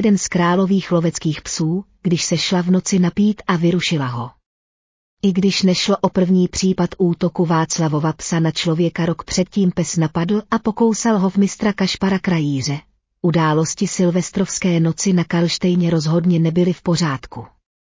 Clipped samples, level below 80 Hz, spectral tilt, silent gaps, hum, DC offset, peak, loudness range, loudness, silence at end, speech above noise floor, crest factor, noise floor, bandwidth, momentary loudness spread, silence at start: under 0.1%; -48 dBFS; -5.5 dB/octave; 4.46-5.17 s; none; under 0.1%; -4 dBFS; 1 LU; -18 LUFS; 0.4 s; over 73 dB; 14 dB; under -90 dBFS; 7.8 kHz; 6 LU; 0 s